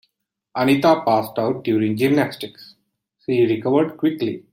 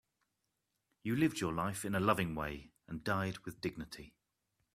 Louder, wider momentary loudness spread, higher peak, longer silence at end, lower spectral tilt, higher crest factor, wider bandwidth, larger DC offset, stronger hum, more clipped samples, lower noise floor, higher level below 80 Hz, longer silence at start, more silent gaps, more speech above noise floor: first, -19 LUFS vs -37 LUFS; about the same, 13 LU vs 15 LU; first, -4 dBFS vs -16 dBFS; second, 0.15 s vs 0.65 s; first, -7 dB/octave vs -5.5 dB/octave; second, 16 dB vs 24 dB; about the same, 16.5 kHz vs 15.5 kHz; neither; neither; neither; second, -75 dBFS vs -85 dBFS; about the same, -64 dBFS vs -62 dBFS; second, 0.55 s vs 1.05 s; neither; first, 56 dB vs 49 dB